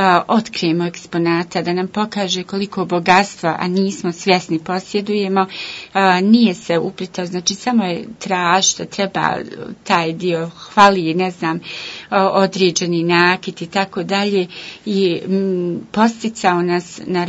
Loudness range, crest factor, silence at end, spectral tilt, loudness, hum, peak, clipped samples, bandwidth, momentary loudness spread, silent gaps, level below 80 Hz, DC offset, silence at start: 2 LU; 16 dB; 0 s; -4.5 dB/octave; -17 LUFS; none; 0 dBFS; under 0.1%; 8 kHz; 9 LU; none; -58 dBFS; under 0.1%; 0 s